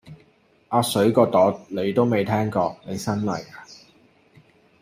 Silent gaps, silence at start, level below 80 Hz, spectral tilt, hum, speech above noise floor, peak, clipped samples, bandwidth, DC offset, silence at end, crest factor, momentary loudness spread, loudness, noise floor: none; 0.05 s; -62 dBFS; -6 dB/octave; none; 38 dB; -4 dBFS; under 0.1%; 15.5 kHz; under 0.1%; 1.1 s; 20 dB; 12 LU; -22 LUFS; -59 dBFS